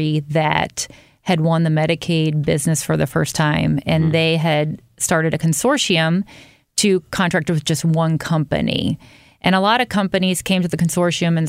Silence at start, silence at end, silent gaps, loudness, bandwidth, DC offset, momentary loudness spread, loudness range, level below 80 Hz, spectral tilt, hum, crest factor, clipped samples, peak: 0 s; 0 s; none; -18 LUFS; 16 kHz; under 0.1%; 6 LU; 1 LU; -48 dBFS; -5 dB/octave; none; 16 dB; under 0.1%; -2 dBFS